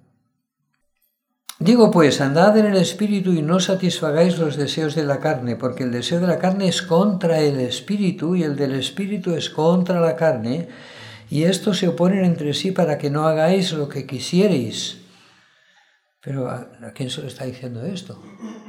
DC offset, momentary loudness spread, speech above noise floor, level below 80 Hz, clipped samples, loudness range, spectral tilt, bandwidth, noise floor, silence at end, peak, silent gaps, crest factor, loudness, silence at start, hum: under 0.1%; 15 LU; 53 dB; -68 dBFS; under 0.1%; 8 LU; -6 dB/octave; 15.5 kHz; -72 dBFS; 0.05 s; 0 dBFS; none; 18 dB; -19 LUFS; 1.6 s; none